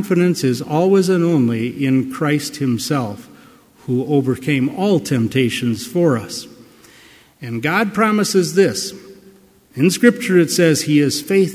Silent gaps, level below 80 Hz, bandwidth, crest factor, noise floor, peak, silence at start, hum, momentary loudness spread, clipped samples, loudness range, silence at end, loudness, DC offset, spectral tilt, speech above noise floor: none; -56 dBFS; 16 kHz; 16 dB; -48 dBFS; 0 dBFS; 0 s; none; 9 LU; under 0.1%; 3 LU; 0 s; -17 LUFS; under 0.1%; -5.5 dB/octave; 31 dB